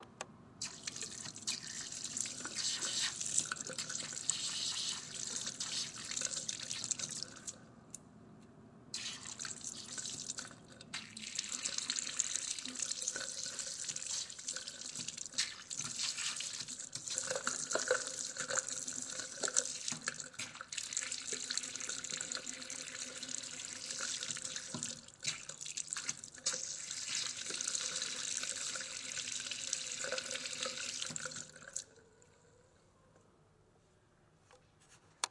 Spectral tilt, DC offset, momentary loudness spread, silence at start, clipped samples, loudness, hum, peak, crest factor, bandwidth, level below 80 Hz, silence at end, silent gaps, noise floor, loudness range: 0 dB/octave; under 0.1%; 9 LU; 0 s; under 0.1%; -39 LUFS; none; -10 dBFS; 32 dB; 11.5 kHz; -78 dBFS; 0 s; none; -69 dBFS; 6 LU